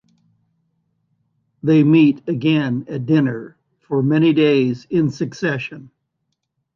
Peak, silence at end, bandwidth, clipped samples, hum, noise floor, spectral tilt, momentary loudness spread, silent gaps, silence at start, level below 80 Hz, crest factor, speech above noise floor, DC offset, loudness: -4 dBFS; 0.9 s; 6.8 kHz; under 0.1%; none; -74 dBFS; -8 dB/octave; 11 LU; none; 1.65 s; -60 dBFS; 16 dB; 58 dB; under 0.1%; -17 LUFS